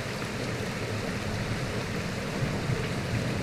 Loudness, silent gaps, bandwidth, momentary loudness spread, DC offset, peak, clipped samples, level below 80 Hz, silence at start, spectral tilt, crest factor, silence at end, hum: -31 LUFS; none; 15.5 kHz; 2 LU; under 0.1%; -16 dBFS; under 0.1%; -46 dBFS; 0 s; -5.5 dB/octave; 14 dB; 0 s; none